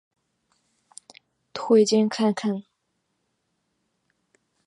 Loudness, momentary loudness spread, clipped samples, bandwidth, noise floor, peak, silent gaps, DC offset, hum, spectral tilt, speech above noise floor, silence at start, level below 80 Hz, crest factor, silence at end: -22 LUFS; 17 LU; under 0.1%; 11 kHz; -75 dBFS; -8 dBFS; none; under 0.1%; none; -5 dB/octave; 55 dB; 1.55 s; -80 dBFS; 20 dB; 2.05 s